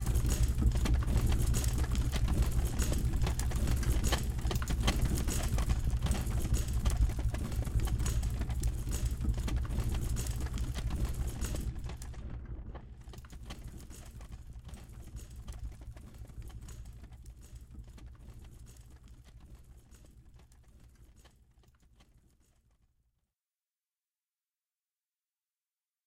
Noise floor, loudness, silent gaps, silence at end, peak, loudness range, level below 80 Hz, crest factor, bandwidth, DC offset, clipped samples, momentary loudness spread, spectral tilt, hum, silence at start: under -90 dBFS; -35 LUFS; none; 4.8 s; -14 dBFS; 20 LU; -36 dBFS; 20 dB; 16.5 kHz; under 0.1%; under 0.1%; 21 LU; -5 dB/octave; none; 0 s